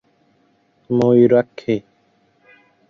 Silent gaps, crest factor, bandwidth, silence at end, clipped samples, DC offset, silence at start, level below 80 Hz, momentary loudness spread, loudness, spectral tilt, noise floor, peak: none; 18 dB; 7 kHz; 1.1 s; under 0.1%; under 0.1%; 0.9 s; -60 dBFS; 11 LU; -16 LUFS; -9 dB/octave; -60 dBFS; -2 dBFS